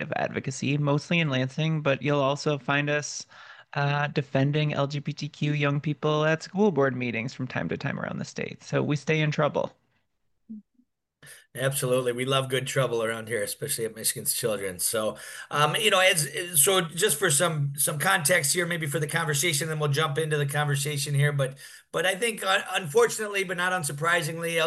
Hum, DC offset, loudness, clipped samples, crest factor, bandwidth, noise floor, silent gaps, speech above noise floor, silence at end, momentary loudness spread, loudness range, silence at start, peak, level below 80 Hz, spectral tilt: none; under 0.1%; -26 LUFS; under 0.1%; 20 dB; 13 kHz; -77 dBFS; none; 51 dB; 0 s; 10 LU; 7 LU; 0 s; -8 dBFS; -70 dBFS; -4 dB/octave